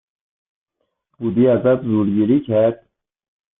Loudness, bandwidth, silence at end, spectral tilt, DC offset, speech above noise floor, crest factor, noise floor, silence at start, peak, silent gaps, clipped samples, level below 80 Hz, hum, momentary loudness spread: -17 LUFS; 3.9 kHz; 0.85 s; -13 dB/octave; under 0.1%; 54 dB; 14 dB; -70 dBFS; 1.2 s; -4 dBFS; none; under 0.1%; -58 dBFS; none; 8 LU